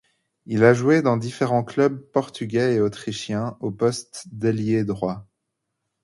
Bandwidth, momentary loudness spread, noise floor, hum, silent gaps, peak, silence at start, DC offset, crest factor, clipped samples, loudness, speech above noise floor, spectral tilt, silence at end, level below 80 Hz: 11.5 kHz; 11 LU; -79 dBFS; none; none; 0 dBFS; 0.5 s; under 0.1%; 22 dB; under 0.1%; -22 LUFS; 58 dB; -6.5 dB/octave; 0.8 s; -58 dBFS